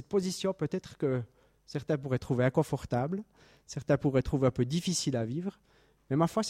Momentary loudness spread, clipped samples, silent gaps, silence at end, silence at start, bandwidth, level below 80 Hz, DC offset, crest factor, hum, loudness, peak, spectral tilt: 12 LU; under 0.1%; none; 0 s; 0 s; 15.5 kHz; -54 dBFS; under 0.1%; 18 dB; none; -32 LUFS; -14 dBFS; -6 dB/octave